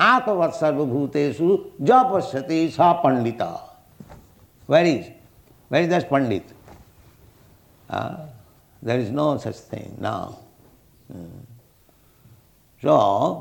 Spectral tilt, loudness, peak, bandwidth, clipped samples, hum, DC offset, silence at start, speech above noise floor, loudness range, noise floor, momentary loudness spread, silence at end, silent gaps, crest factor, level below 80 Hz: -6.5 dB/octave; -21 LUFS; -2 dBFS; 19 kHz; under 0.1%; none; under 0.1%; 0 s; 36 dB; 9 LU; -57 dBFS; 20 LU; 0 s; none; 20 dB; -60 dBFS